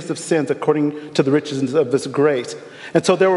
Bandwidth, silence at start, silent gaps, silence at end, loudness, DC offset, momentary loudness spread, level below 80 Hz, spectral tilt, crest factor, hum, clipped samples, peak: 11.5 kHz; 0 s; none; 0 s; -19 LUFS; under 0.1%; 4 LU; -68 dBFS; -5.5 dB/octave; 16 dB; none; under 0.1%; -2 dBFS